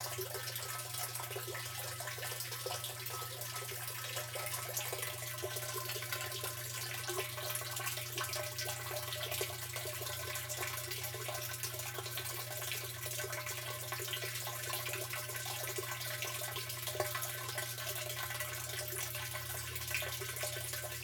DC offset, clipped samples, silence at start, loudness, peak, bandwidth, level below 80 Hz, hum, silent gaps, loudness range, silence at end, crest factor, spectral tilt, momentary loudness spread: under 0.1%; under 0.1%; 0 s; -39 LUFS; -20 dBFS; 19 kHz; -70 dBFS; 60 Hz at -50 dBFS; none; 1 LU; 0 s; 20 dB; -2 dB/octave; 3 LU